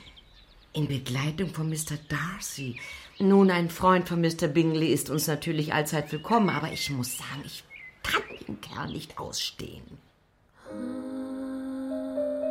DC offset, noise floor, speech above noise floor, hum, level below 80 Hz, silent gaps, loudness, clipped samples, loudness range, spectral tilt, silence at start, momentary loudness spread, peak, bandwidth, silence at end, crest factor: under 0.1%; -63 dBFS; 36 dB; none; -56 dBFS; none; -28 LUFS; under 0.1%; 11 LU; -5 dB/octave; 0 s; 15 LU; -8 dBFS; 16.5 kHz; 0 s; 20 dB